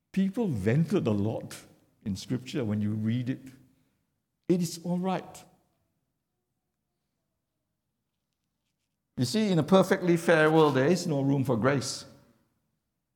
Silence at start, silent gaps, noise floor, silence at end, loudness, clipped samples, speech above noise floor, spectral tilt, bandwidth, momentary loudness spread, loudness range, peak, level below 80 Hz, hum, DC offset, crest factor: 0.15 s; none; -83 dBFS; 1.1 s; -27 LUFS; under 0.1%; 56 dB; -6 dB/octave; 18 kHz; 15 LU; 10 LU; -8 dBFS; -68 dBFS; none; under 0.1%; 20 dB